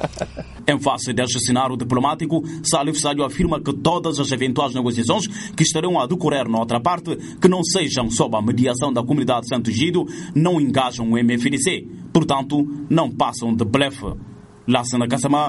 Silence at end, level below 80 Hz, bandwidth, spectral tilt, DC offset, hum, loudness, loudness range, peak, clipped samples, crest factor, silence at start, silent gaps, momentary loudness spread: 0 s; -44 dBFS; 11.5 kHz; -4.5 dB/octave; under 0.1%; none; -20 LUFS; 1 LU; -2 dBFS; under 0.1%; 18 dB; 0 s; none; 4 LU